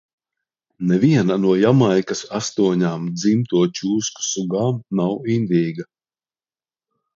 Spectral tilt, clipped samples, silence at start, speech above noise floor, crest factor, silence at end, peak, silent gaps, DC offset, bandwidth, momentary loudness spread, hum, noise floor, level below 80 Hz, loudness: -6 dB/octave; under 0.1%; 0.8 s; over 72 dB; 16 dB; 1.35 s; -4 dBFS; none; under 0.1%; 7.8 kHz; 9 LU; none; under -90 dBFS; -60 dBFS; -19 LUFS